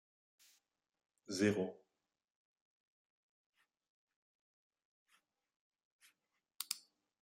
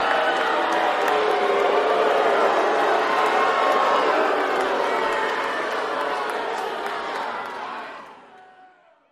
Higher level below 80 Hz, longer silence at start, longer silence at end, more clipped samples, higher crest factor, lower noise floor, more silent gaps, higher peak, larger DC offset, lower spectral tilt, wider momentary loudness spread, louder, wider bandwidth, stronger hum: second, -90 dBFS vs -66 dBFS; first, 1.3 s vs 0 s; second, 0.45 s vs 0.7 s; neither; first, 28 dB vs 16 dB; first, -88 dBFS vs -53 dBFS; first, 2.30-3.53 s, 3.89-4.07 s, 4.16-4.70 s, 4.85-5.06 s, 5.56-5.71 s, 5.85-5.99 s vs none; second, -20 dBFS vs -6 dBFS; neither; first, -4.5 dB/octave vs -2.5 dB/octave; about the same, 10 LU vs 9 LU; second, -40 LUFS vs -21 LUFS; about the same, 16 kHz vs 15.5 kHz; neither